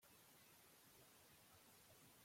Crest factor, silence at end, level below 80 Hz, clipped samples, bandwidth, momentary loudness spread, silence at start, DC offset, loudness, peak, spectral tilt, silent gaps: 14 dB; 0 s; under -90 dBFS; under 0.1%; 16.5 kHz; 0 LU; 0 s; under 0.1%; -67 LUFS; -56 dBFS; -2.5 dB/octave; none